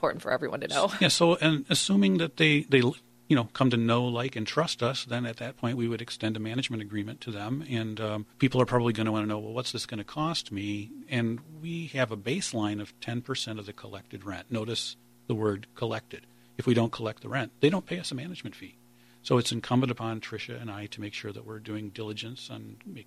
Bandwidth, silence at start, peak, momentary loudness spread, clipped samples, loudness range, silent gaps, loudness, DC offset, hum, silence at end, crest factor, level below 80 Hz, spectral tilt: 14.5 kHz; 0 s; -8 dBFS; 16 LU; under 0.1%; 9 LU; none; -29 LUFS; under 0.1%; none; 0.05 s; 22 dB; -64 dBFS; -5 dB/octave